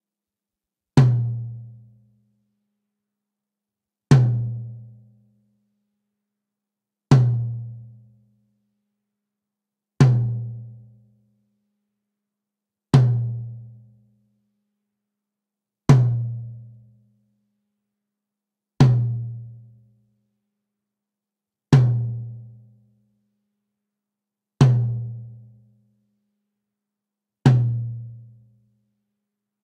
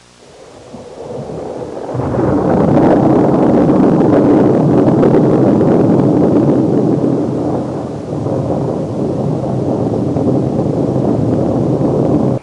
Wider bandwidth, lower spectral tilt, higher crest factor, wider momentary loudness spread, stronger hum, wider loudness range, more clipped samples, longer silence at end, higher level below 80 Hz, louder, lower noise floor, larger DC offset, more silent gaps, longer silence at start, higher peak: second, 8.6 kHz vs 10.5 kHz; second, -8 dB/octave vs -9.5 dB/octave; first, 22 dB vs 10 dB; first, 22 LU vs 12 LU; neither; second, 1 LU vs 6 LU; neither; first, 1.45 s vs 0 s; second, -52 dBFS vs -40 dBFS; second, -20 LUFS vs -12 LUFS; first, -88 dBFS vs -39 dBFS; neither; neither; first, 0.95 s vs 0.4 s; about the same, -2 dBFS vs -2 dBFS